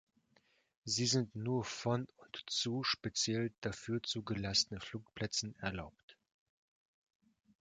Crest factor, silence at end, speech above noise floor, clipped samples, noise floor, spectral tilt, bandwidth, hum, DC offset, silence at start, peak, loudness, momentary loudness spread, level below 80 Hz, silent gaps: 22 dB; 1.5 s; 36 dB; under 0.1%; -74 dBFS; -3.5 dB/octave; 9.6 kHz; none; under 0.1%; 0.85 s; -18 dBFS; -37 LUFS; 14 LU; -64 dBFS; 3.58-3.62 s, 6.03-6.08 s